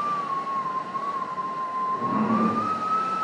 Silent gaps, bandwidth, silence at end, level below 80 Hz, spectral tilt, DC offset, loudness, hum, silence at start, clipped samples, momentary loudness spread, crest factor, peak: none; 10.5 kHz; 0 s; -70 dBFS; -6.5 dB/octave; under 0.1%; -26 LUFS; none; 0 s; under 0.1%; 7 LU; 14 dB; -12 dBFS